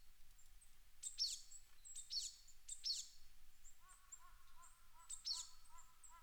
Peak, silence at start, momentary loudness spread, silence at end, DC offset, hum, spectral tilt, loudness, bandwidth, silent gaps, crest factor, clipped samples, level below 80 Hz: -32 dBFS; 0 s; 24 LU; 0 s; under 0.1%; none; 2.5 dB/octave; -47 LUFS; over 20 kHz; none; 20 dB; under 0.1%; -66 dBFS